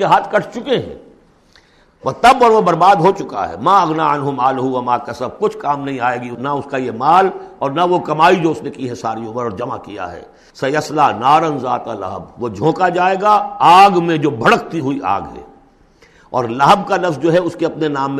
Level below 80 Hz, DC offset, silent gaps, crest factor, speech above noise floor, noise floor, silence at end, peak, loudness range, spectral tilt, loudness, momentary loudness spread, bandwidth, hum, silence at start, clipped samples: -50 dBFS; under 0.1%; none; 14 dB; 35 dB; -50 dBFS; 0 s; 0 dBFS; 5 LU; -5.5 dB/octave; -15 LUFS; 14 LU; 13.5 kHz; none; 0 s; under 0.1%